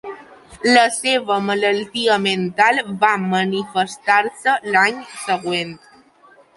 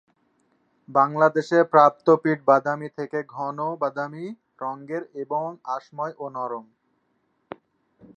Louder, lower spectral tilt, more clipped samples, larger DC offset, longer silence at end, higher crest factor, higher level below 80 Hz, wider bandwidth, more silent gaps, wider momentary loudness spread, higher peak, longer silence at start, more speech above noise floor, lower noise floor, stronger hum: first, -17 LUFS vs -23 LUFS; second, -3.5 dB/octave vs -7.5 dB/octave; neither; neither; second, 0.8 s vs 1.55 s; about the same, 18 dB vs 22 dB; first, -62 dBFS vs -80 dBFS; first, 11.5 kHz vs 7.8 kHz; neither; second, 8 LU vs 18 LU; about the same, -2 dBFS vs -2 dBFS; second, 0.05 s vs 0.9 s; second, 32 dB vs 48 dB; second, -50 dBFS vs -70 dBFS; neither